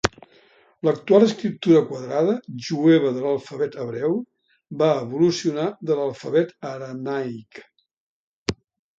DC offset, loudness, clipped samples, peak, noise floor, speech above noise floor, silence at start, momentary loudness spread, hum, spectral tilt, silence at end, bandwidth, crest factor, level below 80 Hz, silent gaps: under 0.1%; -22 LUFS; under 0.1%; 0 dBFS; -56 dBFS; 35 dB; 0.05 s; 14 LU; none; -6 dB/octave; 0.45 s; 7.8 kHz; 22 dB; -56 dBFS; 7.97-8.46 s